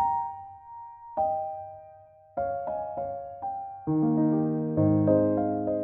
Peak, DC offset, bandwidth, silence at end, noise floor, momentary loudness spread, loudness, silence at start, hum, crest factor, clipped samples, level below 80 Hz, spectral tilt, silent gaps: -10 dBFS; under 0.1%; 2.3 kHz; 0 s; -53 dBFS; 20 LU; -28 LUFS; 0 s; none; 18 dB; under 0.1%; -58 dBFS; -12.5 dB/octave; none